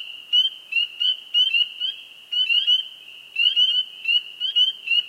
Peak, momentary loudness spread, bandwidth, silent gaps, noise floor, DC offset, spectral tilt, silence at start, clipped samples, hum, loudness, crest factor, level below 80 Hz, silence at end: -8 dBFS; 11 LU; 15.5 kHz; none; -42 dBFS; under 0.1%; 3.5 dB/octave; 0 s; under 0.1%; none; -19 LUFS; 16 dB; -86 dBFS; 0 s